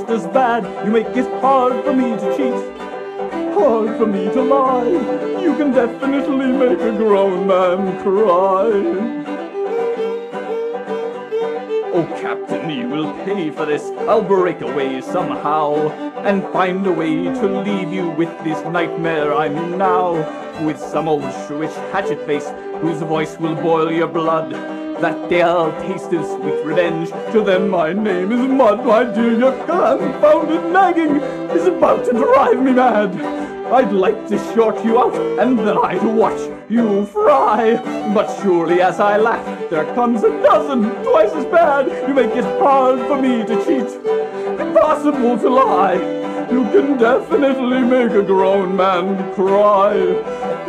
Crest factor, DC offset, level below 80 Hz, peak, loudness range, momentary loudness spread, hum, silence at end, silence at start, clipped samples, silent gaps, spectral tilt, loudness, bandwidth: 14 dB; under 0.1%; -56 dBFS; -2 dBFS; 5 LU; 9 LU; none; 0 s; 0 s; under 0.1%; none; -6.5 dB/octave; -16 LUFS; 11 kHz